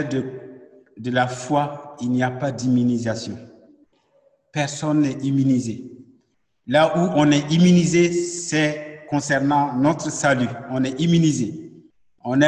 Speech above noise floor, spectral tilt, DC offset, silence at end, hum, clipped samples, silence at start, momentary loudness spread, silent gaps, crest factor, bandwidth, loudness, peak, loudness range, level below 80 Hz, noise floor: 46 dB; -5.5 dB/octave; under 0.1%; 0 s; none; under 0.1%; 0 s; 14 LU; none; 16 dB; 10 kHz; -20 LUFS; -4 dBFS; 6 LU; -58 dBFS; -66 dBFS